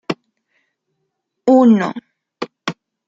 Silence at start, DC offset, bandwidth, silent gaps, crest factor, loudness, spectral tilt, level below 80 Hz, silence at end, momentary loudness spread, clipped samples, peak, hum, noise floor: 0.1 s; under 0.1%; 7.6 kHz; none; 18 dB; -16 LUFS; -7 dB/octave; -66 dBFS; 0.35 s; 20 LU; under 0.1%; -2 dBFS; none; -74 dBFS